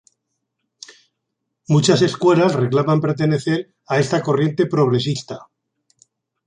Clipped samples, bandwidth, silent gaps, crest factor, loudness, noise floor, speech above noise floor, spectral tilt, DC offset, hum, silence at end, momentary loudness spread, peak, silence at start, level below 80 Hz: under 0.1%; 10 kHz; none; 16 dB; -18 LUFS; -77 dBFS; 60 dB; -6 dB/octave; under 0.1%; none; 1.05 s; 9 LU; -2 dBFS; 1.7 s; -60 dBFS